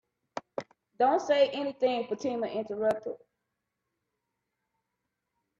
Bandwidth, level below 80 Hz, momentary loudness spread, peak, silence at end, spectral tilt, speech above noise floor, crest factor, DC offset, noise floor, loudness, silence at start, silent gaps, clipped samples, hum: 8 kHz; -76 dBFS; 16 LU; -12 dBFS; 2.45 s; -4.5 dB/octave; 56 dB; 20 dB; under 0.1%; -84 dBFS; -29 LUFS; 0.35 s; none; under 0.1%; none